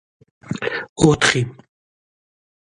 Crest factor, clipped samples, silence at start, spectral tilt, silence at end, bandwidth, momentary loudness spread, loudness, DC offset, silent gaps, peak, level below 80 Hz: 22 dB; under 0.1%; 0.45 s; -4.5 dB/octave; 1.25 s; 11.5 kHz; 14 LU; -18 LUFS; under 0.1%; 0.89-0.96 s; 0 dBFS; -46 dBFS